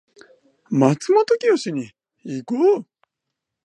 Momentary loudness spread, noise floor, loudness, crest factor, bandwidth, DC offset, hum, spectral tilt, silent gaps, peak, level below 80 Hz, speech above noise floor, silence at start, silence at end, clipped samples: 15 LU; -82 dBFS; -19 LUFS; 20 dB; 10.5 kHz; under 0.1%; none; -6.5 dB/octave; none; -2 dBFS; -72 dBFS; 63 dB; 0.7 s; 0.85 s; under 0.1%